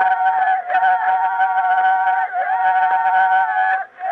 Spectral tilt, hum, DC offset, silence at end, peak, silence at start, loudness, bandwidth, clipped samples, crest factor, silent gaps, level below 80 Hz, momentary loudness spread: -2.5 dB/octave; none; under 0.1%; 0 s; -4 dBFS; 0 s; -17 LUFS; 4.2 kHz; under 0.1%; 12 dB; none; -78 dBFS; 3 LU